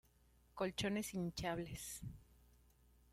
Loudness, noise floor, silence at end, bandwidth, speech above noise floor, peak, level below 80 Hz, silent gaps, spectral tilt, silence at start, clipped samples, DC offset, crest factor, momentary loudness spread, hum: -44 LUFS; -72 dBFS; 0.8 s; 16 kHz; 28 dB; -28 dBFS; -64 dBFS; none; -4.5 dB/octave; 0.55 s; under 0.1%; under 0.1%; 20 dB; 15 LU; 60 Hz at -65 dBFS